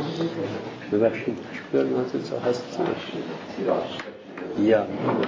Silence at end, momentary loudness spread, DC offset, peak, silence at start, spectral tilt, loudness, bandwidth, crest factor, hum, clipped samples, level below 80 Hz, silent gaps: 0 s; 12 LU; under 0.1%; -8 dBFS; 0 s; -6.5 dB/octave; -26 LUFS; 7.8 kHz; 18 dB; none; under 0.1%; -62 dBFS; none